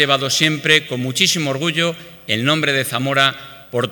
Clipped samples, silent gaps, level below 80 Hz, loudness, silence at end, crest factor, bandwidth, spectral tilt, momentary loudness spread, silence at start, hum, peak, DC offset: under 0.1%; none; -62 dBFS; -16 LUFS; 0 s; 18 dB; 19 kHz; -3 dB/octave; 8 LU; 0 s; none; 0 dBFS; under 0.1%